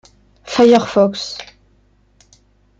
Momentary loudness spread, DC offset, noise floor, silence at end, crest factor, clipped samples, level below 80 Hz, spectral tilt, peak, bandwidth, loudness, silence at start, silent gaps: 16 LU; under 0.1%; -55 dBFS; 1.35 s; 18 dB; under 0.1%; -54 dBFS; -5 dB/octave; 0 dBFS; 7.8 kHz; -14 LUFS; 0.45 s; none